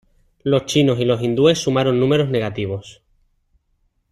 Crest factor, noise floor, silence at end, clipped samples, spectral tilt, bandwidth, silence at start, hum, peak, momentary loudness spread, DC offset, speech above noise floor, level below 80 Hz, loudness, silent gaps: 16 dB; -66 dBFS; 1.2 s; under 0.1%; -6 dB/octave; 14.5 kHz; 0.45 s; none; -2 dBFS; 10 LU; under 0.1%; 48 dB; -52 dBFS; -18 LUFS; none